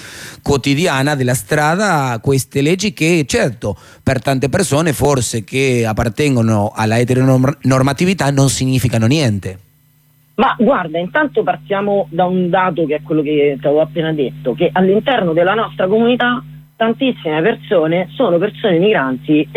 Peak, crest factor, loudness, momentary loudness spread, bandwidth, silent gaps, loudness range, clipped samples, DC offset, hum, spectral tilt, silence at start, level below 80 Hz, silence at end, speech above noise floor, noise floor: -2 dBFS; 12 dB; -15 LUFS; 5 LU; 15.5 kHz; none; 2 LU; under 0.1%; under 0.1%; none; -5.5 dB/octave; 0 s; -42 dBFS; 0 s; 38 dB; -52 dBFS